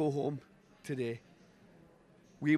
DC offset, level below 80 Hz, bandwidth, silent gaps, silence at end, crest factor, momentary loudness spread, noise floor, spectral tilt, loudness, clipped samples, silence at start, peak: under 0.1%; -76 dBFS; 12.5 kHz; none; 0 s; 20 dB; 25 LU; -62 dBFS; -7.5 dB/octave; -39 LUFS; under 0.1%; 0 s; -16 dBFS